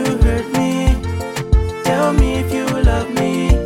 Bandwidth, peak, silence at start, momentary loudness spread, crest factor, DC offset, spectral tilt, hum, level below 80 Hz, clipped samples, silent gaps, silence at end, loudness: 16 kHz; 0 dBFS; 0 s; 4 LU; 14 dB; under 0.1%; -6.5 dB/octave; none; -18 dBFS; under 0.1%; none; 0 s; -17 LUFS